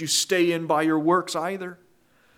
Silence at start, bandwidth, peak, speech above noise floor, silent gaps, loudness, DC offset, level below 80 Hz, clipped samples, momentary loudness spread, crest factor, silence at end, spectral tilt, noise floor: 0 s; 16.5 kHz; -8 dBFS; 37 dB; none; -23 LUFS; under 0.1%; -76 dBFS; under 0.1%; 11 LU; 16 dB; 0.65 s; -3.5 dB/octave; -60 dBFS